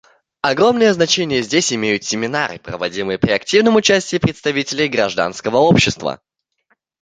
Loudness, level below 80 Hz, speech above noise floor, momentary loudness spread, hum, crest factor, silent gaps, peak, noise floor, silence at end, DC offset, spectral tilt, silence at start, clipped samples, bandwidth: -16 LUFS; -46 dBFS; 48 dB; 9 LU; none; 16 dB; none; 0 dBFS; -64 dBFS; 0.85 s; under 0.1%; -4 dB/octave; 0.45 s; under 0.1%; 9.4 kHz